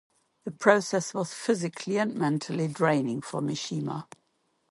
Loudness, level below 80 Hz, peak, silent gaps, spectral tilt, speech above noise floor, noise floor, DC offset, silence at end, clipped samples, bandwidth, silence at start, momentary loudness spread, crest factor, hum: -28 LUFS; -74 dBFS; -6 dBFS; none; -5 dB/octave; 45 dB; -73 dBFS; under 0.1%; 0.65 s; under 0.1%; 11.5 kHz; 0.45 s; 11 LU; 24 dB; none